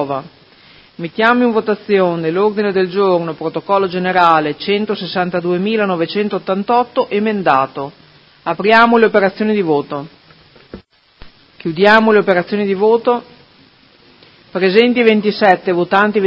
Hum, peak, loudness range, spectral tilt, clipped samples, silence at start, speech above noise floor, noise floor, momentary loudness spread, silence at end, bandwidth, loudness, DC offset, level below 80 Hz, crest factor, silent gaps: none; 0 dBFS; 2 LU; -7.5 dB/octave; under 0.1%; 0 s; 34 dB; -48 dBFS; 12 LU; 0 s; 7.4 kHz; -14 LUFS; under 0.1%; -56 dBFS; 14 dB; none